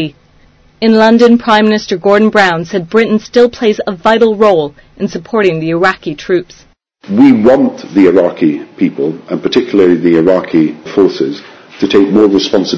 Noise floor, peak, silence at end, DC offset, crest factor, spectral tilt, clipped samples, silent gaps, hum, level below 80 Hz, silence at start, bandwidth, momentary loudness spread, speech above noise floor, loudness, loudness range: -45 dBFS; 0 dBFS; 0 s; under 0.1%; 10 dB; -6 dB/octave; 1%; none; none; -46 dBFS; 0 s; 8 kHz; 10 LU; 36 dB; -10 LUFS; 3 LU